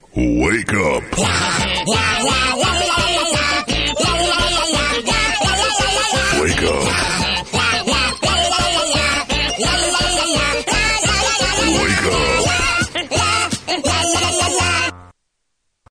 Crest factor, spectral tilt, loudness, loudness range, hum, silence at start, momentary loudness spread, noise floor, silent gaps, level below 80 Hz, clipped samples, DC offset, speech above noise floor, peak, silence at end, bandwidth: 12 dB; -2.5 dB/octave; -15 LUFS; 1 LU; none; 0.15 s; 3 LU; -72 dBFS; none; -30 dBFS; under 0.1%; under 0.1%; 55 dB; -4 dBFS; 0.85 s; 14.5 kHz